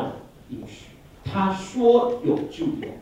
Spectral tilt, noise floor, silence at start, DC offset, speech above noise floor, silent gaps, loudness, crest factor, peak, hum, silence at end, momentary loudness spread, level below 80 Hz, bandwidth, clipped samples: -7 dB/octave; -46 dBFS; 0 s; under 0.1%; 25 dB; none; -23 LUFS; 18 dB; -6 dBFS; none; 0 s; 21 LU; -54 dBFS; 10 kHz; under 0.1%